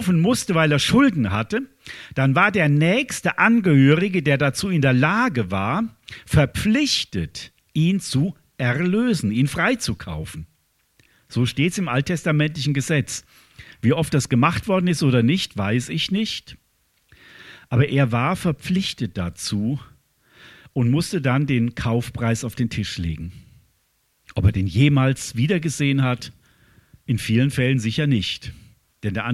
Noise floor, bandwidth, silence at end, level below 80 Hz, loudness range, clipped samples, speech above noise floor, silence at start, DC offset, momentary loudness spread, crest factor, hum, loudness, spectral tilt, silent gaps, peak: -66 dBFS; 14.5 kHz; 0 s; -44 dBFS; 6 LU; under 0.1%; 46 dB; 0 s; under 0.1%; 13 LU; 20 dB; none; -21 LUFS; -5.5 dB/octave; none; -2 dBFS